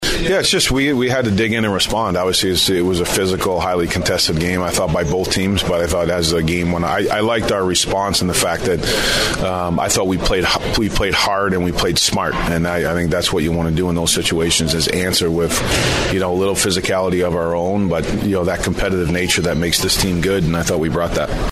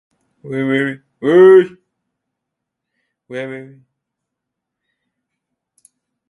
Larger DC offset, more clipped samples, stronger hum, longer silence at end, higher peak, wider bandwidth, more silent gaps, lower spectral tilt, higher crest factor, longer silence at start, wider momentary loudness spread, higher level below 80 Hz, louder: neither; neither; neither; second, 0 s vs 2.65 s; about the same, -2 dBFS vs 0 dBFS; first, 15.5 kHz vs 11 kHz; neither; second, -4 dB/octave vs -7.5 dB/octave; about the same, 14 dB vs 18 dB; second, 0 s vs 0.45 s; second, 3 LU vs 22 LU; first, -30 dBFS vs -68 dBFS; second, -16 LUFS vs -12 LUFS